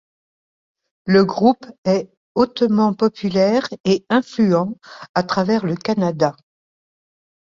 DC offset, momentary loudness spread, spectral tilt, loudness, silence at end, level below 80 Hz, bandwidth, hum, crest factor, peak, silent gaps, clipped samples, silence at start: under 0.1%; 7 LU; -7 dB/octave; -18 LUFS; 1.1 s; -58 dBFS; 7.4 kHz; none; 16 dB; -2 dBFS; 1.78-1.83 s, 2.17-2.35 s, 3.80-3.84 s, 5.09-5.14 s; under 0.1%; 1.05 s